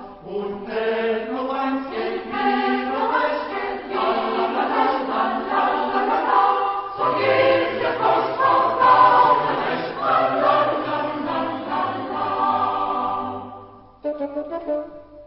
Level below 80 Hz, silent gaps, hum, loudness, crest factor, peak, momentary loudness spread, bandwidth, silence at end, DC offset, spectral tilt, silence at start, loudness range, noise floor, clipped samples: -58 dBFS; none; none; -21 LUFS; 18 dB; -2 dBFS; 11 LU; 5.8 kHz; 0 s; under 0.1%; -9.5 dB/octave; 0 s; 7 LU; -43 dBFS; under 0.1%